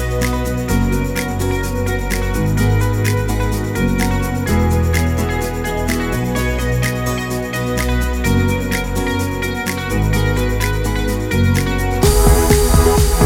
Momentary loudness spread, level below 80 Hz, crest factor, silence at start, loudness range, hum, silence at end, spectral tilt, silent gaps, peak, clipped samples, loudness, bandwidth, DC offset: 7 LU; -20 dBFS; 16 dB; 0 s; 3 LU; none; 0 s; -5.5 dB/octave; none; 0 dBFS; under 0.1%; -17 LUFS; 17.5 kHz; under 0.1%